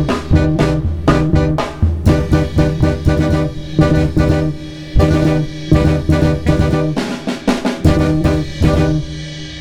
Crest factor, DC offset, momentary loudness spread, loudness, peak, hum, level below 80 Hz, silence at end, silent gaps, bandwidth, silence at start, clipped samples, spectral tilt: 14 dB; 1%; 6 LU; -15 LUFS; 0 dBFS; none; -22 dBFS; 0 s; none; 12 kHz; 0 s; under 0.1%; -7.5 dB/octave